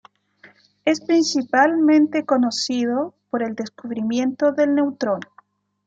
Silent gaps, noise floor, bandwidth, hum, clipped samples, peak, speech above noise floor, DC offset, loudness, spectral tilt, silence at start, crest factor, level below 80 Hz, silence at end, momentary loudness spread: none; -55 dBFS; 7.8 kHz; 50 Hz at -55 dBFS; under 0.1%; -4 dBFS; 36 dB; under 0.1%; -20 LUFS; -4 dB/octave; 0.85 s; 18 dB; -72 dBFS; 0.65 s; 11 LU